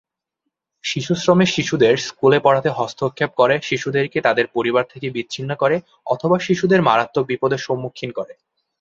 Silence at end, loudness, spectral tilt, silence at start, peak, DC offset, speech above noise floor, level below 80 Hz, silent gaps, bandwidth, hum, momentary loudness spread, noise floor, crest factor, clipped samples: 0.5 s; -19 LUFS; -5.5 dB/octave; 0.85 s; 0 dBFS; under 0.1%; 60 dB; -58 dBFS; none; 7.6 kHz; none; 11 LU; -78 dBFS; 18 dB; under 0.1%